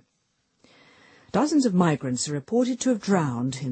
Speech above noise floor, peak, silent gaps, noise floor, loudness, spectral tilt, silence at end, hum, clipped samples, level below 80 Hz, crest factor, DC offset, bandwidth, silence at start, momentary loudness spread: 49 dB; -6 dBFS; none; -72 dBFS; -24 LUFS; -5.5 dB/octave; 0 s; none; under 0.1%; -64 dBFS; 20 dB; under 0.1%; 8.8 kHz; 1.35 s; 6 LU